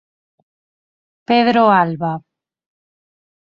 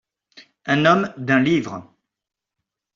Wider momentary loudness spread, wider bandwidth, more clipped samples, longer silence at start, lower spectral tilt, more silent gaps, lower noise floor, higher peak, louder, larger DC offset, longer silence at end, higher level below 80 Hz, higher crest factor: second, 12 LU vs 18 LU; about the same, 7 kHz vs 7.4 kHz; neither; first, 1.3 s vs 0.35 s; first, -8 dB/octave vs -6.5 dB/octave; neither; first, under -90 dBFS vs -86 dBFS; about the same, -2 dBFS vs -4 dBFS; first, -15 LUFS vs -18 LUFS; neither; first, 1.4 s vs 1.15 s; about the same, -64 dBFS vs -62 dBFS; about the same, 18 dB vs 18 dB